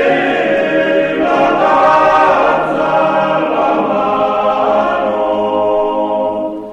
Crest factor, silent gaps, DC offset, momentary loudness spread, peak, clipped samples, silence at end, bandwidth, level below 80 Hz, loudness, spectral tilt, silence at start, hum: 12 dB; none; under 0.1%; 5 LU; -2 dBFS; under 0.1%; 0 s; 8.8 kHz; -46 dBFS; -12 LUFS; -6 dB/octave; 0 s; none